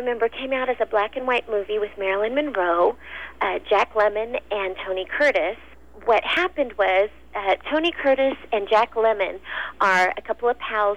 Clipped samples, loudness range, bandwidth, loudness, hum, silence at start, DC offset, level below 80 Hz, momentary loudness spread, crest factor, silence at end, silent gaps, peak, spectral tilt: under 0.1%; 2 LU; 10.5 kHz; -22 LUFS; none; 0 s; 0.5%; -52 dBFS; 7 LU; 14 dB; 0 s; none; -8 dBFS; -4 dB/octave